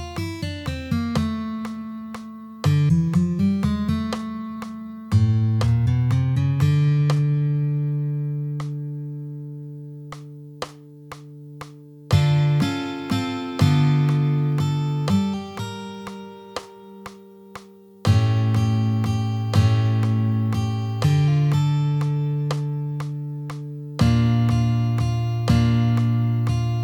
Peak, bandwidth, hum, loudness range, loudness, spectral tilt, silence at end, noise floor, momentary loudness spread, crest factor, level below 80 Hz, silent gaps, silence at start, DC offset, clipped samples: -6 dBFS; 12.5 kHz; none; 7 LU; -22 LUFS; -7.5 dB/octave; 0 s; -43 dBFS; 18 LU; 16 dB; -42 dBFS; none; 0 s; under 0.1%; under 0.1%